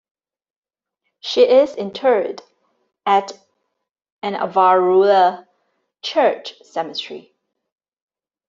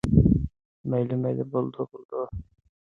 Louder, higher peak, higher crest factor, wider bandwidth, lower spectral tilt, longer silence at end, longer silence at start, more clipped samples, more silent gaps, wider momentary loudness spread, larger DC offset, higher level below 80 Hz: first, -17 LUFS vs -27 LUFS; first, -2 dBFS vs -6 dBFS; about the same, 18 dB vs 20 dB; second, 7.6 kHz vs 10.5 kHz; second, -4.5 dB/octave vs -10.5 dB/octave; first, 1.3 s vs 0.55 s; first, 1.25 s vs 0.05 s; neither; second, 4.12-4.17 s vs 0.65-0.84 s, 2.05-2.09 s; about the same, 18 LU vs 16 LU; neither; second, -70 dBFS vs -38 dBFS